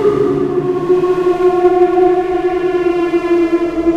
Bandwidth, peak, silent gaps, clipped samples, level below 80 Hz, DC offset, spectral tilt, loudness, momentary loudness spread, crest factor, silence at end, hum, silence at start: 7.2 kHz; 0 dBFS; none; under 0.1%; -40 dBFS; under 0.1%; -7.5 dB/octave; -13 LUFS; 4 LU; 12 dB; 0 s; none; 0 s